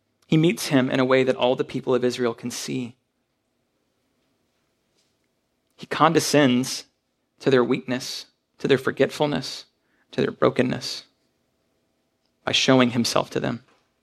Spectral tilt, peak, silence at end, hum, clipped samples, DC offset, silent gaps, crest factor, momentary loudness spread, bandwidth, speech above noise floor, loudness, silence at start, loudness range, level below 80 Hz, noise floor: -4.5 dB/octave; -2 dBFS; 0.45 s; none; under 0.1%; under 0.1%; none; 22 dB; 14 LU; 14.5 kHz; 52 dB; -22 LUFS; 0.3 s; 7 LU; -64 dBFS; -73 dBFS